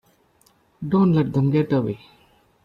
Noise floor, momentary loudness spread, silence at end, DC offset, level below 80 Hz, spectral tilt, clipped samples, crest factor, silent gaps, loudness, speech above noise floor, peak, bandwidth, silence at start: -60 dBFS; 15 LU; 0.7 s; under 0.1%; -56 dBFS; -10 dB/octave; under 0.1%; 14 dB; none; -20 LUFS; 40 dB; -8 dBFS; 5.4 kHz; 0.8 s